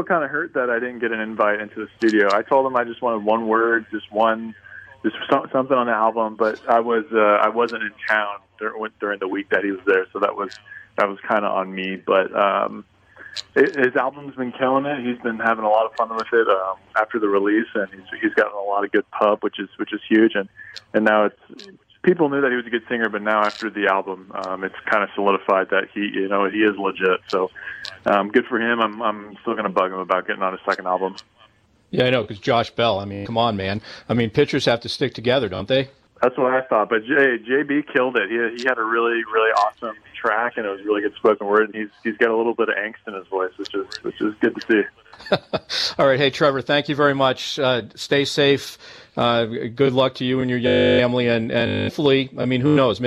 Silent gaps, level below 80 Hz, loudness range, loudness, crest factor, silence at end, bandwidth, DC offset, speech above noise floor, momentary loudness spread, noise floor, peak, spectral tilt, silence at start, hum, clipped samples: none; -60 dBFS; 3 LU; -20 LUFS; 16 dB; 0 s; 13 kHz; under 0.1%; 35 dB; 10 LU; -56 dBFS; -4 dBFS; -5.5 dB/octave; 0 s; none; under 0.1%